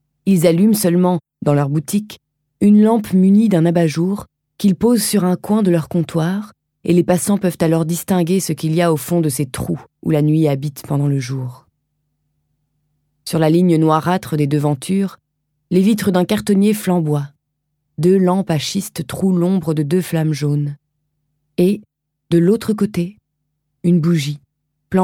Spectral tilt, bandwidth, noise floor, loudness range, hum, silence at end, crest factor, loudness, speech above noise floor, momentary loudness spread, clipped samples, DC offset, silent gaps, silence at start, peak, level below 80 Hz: -6.5 dB/octave; 17.5 kHz; -72 dBFS; 5 LU; none; 0 s; 16 dB; -16 LUFS; 57 dB; 11 LU; under 0.1%; under 0.1%; none; 0.25 s; 0 dBFS; -54 dBFS